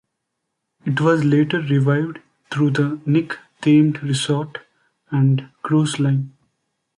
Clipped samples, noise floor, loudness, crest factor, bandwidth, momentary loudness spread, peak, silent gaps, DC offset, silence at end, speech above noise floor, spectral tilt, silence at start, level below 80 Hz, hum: under 0.1%; -77 dBFS; -19 LUFS; 16 dB; 11.5 kHz; 13 LU; -4 dBFS; none; under 0.1%; 0.7 s; 59 dB; -6.5 dB/octave; 0.85 s; -62 dBFS; none